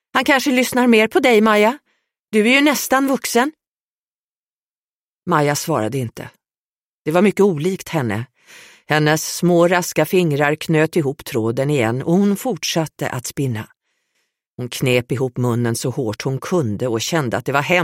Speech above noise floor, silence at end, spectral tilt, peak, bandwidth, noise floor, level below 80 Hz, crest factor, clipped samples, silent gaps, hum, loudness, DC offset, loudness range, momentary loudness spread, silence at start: over 73 dB; 0 s; -5 dB/octave; -2 dBFS; 16.5 kHz; under -90 dBFS; -58 dBFS; 16 dB; under 0.1%; 2.19-2.26 s, 3.67-5.22 s, 6.58-7.00 s, 14.47-14.56 s; none; -17 LUFS; under 0.1%; 7 LU; 10 LU; 0.15 s